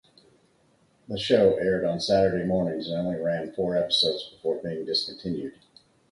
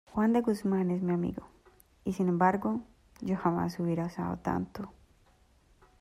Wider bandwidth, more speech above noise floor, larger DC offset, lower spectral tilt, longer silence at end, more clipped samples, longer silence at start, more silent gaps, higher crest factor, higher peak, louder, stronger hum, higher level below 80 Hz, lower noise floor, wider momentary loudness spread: second, 11.5 kHz vs 13.5 kHz; first, 38 dB vs 34 dB; neither; second, -5.5 dB/octave vs -8.5 dB/octave; second, 0.6 s vs 1.1 s; neither; first, 1.1 s vs 0.1 s; neither; about the same, 18 dB vs 20 dB; first, -8 dBFS vs -12 dBFS; first, -25 LUFS vs -31 LUFS; neither; about the same, -56 dBFS vs -58 dBFS; about the same, -64 dBFS vs -64 dBFS; about the same, 11 LU vs 13 LU